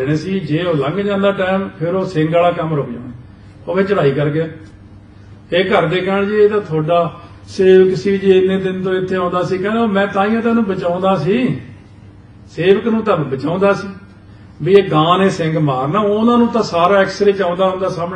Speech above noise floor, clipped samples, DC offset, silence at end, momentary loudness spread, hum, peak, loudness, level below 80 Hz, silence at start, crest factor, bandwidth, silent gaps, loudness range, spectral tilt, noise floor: 25 dB; under 0.1%; under 0.1%; 0 s; 8 LU; none; 0 dBFS; -15 LUFS; -48 dBFS; 0 s; 14 dB; 9 kHz; none; 4 LU; -7 dB/octave; -39 dBFS